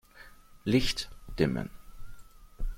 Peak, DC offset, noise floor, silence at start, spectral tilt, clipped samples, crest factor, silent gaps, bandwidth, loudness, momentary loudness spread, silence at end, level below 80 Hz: -12 dBFS; under 0.1%; -53 dBFS; 0.15 s; -5.5 dB/octave; under 0.1%; 20 dB; none; 16.5 kHz; -31 LUFS; 15 LU; 0 s; -42 dBFS